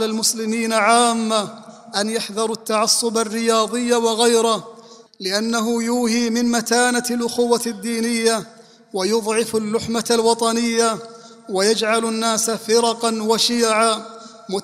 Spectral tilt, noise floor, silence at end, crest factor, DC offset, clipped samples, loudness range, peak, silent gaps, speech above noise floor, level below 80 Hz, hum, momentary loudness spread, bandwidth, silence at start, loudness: -2.5 dB/octave; -43 dBFS; 0 s; 18 dB; under 0.1%; under 0.1%; 2 LU; -2 dBFS; none; 24 dB; -62 dBFS; none; 8 LU; 15.5 kHz; 0 s; -19 LUFS